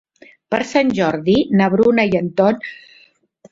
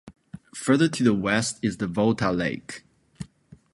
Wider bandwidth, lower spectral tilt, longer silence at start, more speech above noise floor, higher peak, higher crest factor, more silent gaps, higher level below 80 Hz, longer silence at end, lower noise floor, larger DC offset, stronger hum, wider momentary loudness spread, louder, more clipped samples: second, 7.8 kHz vs 11.5 kHz; first, -6.5 dB/octave vs -5 dB/octave; first, 0.5 s vs 0.05 s; first, 37 dB vs 29 dB; first, -2 dBFS vs -6 dBFS; about the same, 16 dB vs 20 dB; neither; about the same, -52 dBFS vs -54 dBFS; first, 0.75 s vs 0.5 s; about the same, -53 dBFS vs -53 dBFS; neither; neither; second, 9 LU vs 21 LU; first, -16 LUFS vs -24 LUFS; neither